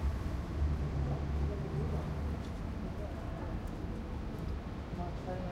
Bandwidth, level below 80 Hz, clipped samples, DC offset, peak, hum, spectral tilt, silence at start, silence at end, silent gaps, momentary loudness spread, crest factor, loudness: 9.6 kHz; -40 dBFS; under 0.1%; under 0.1%; -22 dBFS; none; -8 dB/octave; 0 s; 0 s; none; 5 LU; 14 dB; -39 LUFS